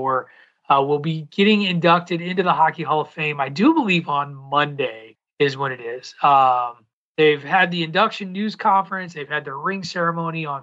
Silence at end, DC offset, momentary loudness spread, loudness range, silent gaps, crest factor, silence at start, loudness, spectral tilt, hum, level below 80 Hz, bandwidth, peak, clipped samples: 0 s; under 0.1%; 10 LU; 2 LU; 5.33-5.37 s, 6.93-7.15 s; 16 dB; 0 s; -20 LUFS; -6 dB/octave; none; -74 dBFS; 8 kHz; -4 dBFS; under 0.1%